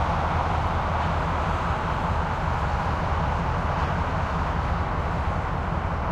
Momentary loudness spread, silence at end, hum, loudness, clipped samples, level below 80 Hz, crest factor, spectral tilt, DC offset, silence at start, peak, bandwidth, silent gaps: 2 LU; 0 s; none; -26 LUFS; under 0.1%; -30 dBFS; 14 dB; -7 dB/octave; under 0.1%; 0 s; -12 dBFS; 9 kHz; none